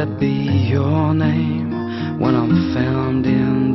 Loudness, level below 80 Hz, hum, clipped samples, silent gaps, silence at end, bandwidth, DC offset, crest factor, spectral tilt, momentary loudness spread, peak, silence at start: -18 LUFS; -44 dBFS; none; under 0.1%; none; 0 s; 6 kHz; under 0.1%; 14 dB; -9.5 dB/octave; 5 LU; -4 dBFS; 0 s